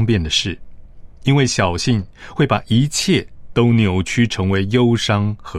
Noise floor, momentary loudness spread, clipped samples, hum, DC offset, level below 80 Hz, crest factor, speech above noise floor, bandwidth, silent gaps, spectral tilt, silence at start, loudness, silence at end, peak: -36 dBFS; 7 LU; under 0.1%; none; under 0.1%; -40 dBFS; 14 dB; 20 dB; 13.5 kHz; none; -5 dB/octave; 0 s; -17 LUFS; 0 s; -2 dBFS